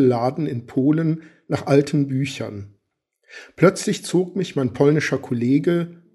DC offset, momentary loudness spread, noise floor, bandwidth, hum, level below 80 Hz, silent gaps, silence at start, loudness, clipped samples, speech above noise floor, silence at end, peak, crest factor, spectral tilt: under 0.1%; 10 LU; -72 dBFS; 12 kHz; none; -62 dBFS; none; 0 s; -21 LUFS; under 0.1%; 52 dB; 0.2 s; 0 dBFS; 20 dB; -6.5 dB/octave